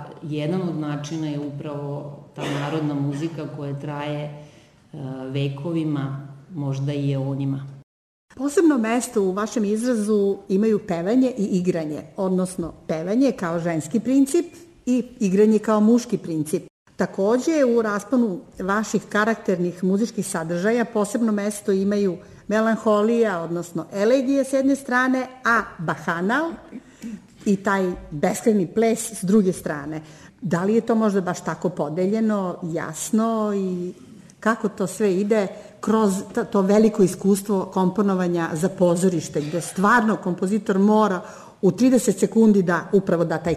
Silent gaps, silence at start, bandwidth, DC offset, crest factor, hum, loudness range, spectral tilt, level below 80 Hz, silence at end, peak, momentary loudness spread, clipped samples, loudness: 7.83-8.28 s, 16.70-16.86 s; 0 s; 13.5 kHz; under 0.1%; 14 dB; none; 7 LU; -6 dB/octave; -58 dBFS; 0 s; -6 dBFS; 12 LU; under 0.1%; -22 LUFS